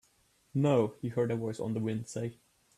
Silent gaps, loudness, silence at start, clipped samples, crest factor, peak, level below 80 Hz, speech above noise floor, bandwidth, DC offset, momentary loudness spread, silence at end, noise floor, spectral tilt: none; -33 LUFS; 0.55 s; under 0.1%; 18 dB; -16 dBFS; -68 dBFS; 38 dB; 13 kHz; under 0.1%; 11 LU; 0.45 s; -69 dBFS; -7.5 dB/octave